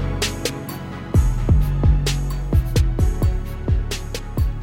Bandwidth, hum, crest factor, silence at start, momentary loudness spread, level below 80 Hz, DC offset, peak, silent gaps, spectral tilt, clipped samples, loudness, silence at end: 17 kHz; none; 14 dB; 0 s; 9 LU; -22 dBFS; under 0.1%; -4 dBFS; none; -5.5 dB/octave; under 0.1%; -22 LUFS; 0 s